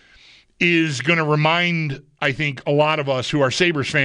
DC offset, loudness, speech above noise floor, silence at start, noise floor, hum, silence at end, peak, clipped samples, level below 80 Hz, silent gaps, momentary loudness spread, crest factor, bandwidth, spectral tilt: under 0.1%; -19 LUFS; 31 dB; 0.6 s; -50 dBFS; none; 0 s; -4 dBFS; under 0.1%; -54 dBFS; none; 6 LU; 14 dB; 10.5 kHz; -5 dB/octave